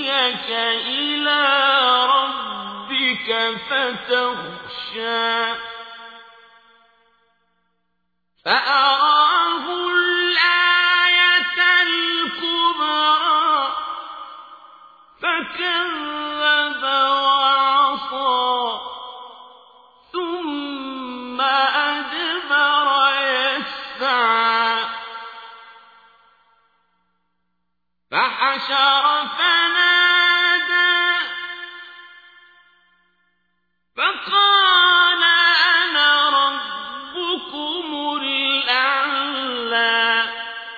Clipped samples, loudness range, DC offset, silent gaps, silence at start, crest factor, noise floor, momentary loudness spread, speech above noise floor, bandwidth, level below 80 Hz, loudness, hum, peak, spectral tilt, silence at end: under 0.1%; 10 LU; under 0.1%; none; 0 s; 18 dB; -78 dBFS; 16 LU; 58 dB; 5 kHz; -66 dBFS; -17 LUFS; none; -2 dBFS; -3 dB/octave; 0 s